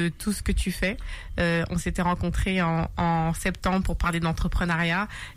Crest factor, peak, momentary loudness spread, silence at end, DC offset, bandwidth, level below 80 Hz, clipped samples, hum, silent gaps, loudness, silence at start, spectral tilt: 12 dB; -14 dBFS; 4 LU; 0 s; under 0.1%; 15.5 kHz; -32 dBFS; under 0.1%; none; none; -26 LUFS; 0 s; -5.5 dB/octave